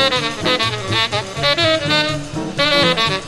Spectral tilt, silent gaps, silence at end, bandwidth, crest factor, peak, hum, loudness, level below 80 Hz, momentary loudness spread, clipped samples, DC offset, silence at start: -3.5 dB/octave; none; 0 s; 13.5 kHz; 16 dB; -2 dBFS; none; -16 LUFS; -42 dBFS; 6 LU; under 0.1%; under 0.1%; 0 s